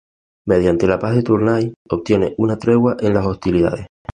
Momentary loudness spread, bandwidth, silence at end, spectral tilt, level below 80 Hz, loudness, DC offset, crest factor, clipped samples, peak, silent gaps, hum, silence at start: 6 LU; 9.8 kHz; 0.3 s; -8.5 dB/octave; -40 dBFS; -17 LUFS; under 0.1%; 14 dB; under 0.1%; -2 dBFS; 1.76-1.85 s; none; 0.45 s